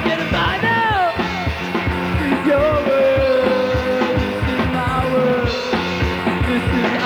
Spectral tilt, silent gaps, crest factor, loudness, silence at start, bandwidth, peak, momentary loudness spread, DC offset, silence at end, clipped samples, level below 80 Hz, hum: -6.5 dB/octave; none; 12 dB; -18 LUFS; 0 s; over 20 kHz; -6 dBFS; 5 LU; under 0.1%; 0 s; under 0.1%; -32 dBFS; none